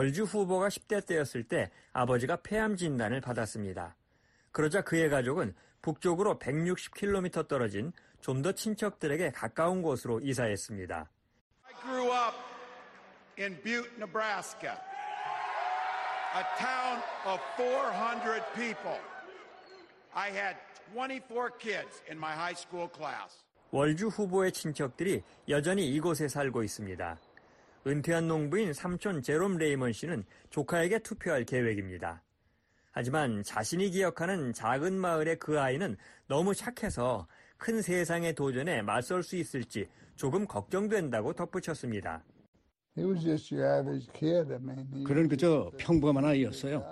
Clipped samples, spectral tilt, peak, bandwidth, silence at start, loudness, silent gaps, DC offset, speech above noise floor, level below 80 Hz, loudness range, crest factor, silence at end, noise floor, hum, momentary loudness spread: under 0.1%; -5.5 dB/octave; -16 dBFS; 12.5 kHz; 0 s; -33 LUFS; 11.41-11.51 s, 42.48-42.53 s; under 0.1%; 40 dB; -60 dBFS; 5 LU; 18 dB; 0 s; -73 dBFS; none; 11 LU